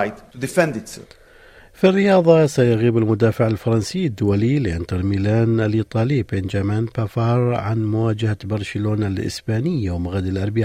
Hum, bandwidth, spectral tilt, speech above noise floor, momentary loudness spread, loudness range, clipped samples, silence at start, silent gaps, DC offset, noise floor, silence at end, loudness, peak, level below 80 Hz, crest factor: none; 14 kHz; -7.5 dB/octave; 28 dB; 9 LU; 4 LU; under 0.1%; 0 s; none; under 0.1%; -46 dBFS; 0 s; -19 LUFS; -2 dBFS; -48 dBFS; 16 dB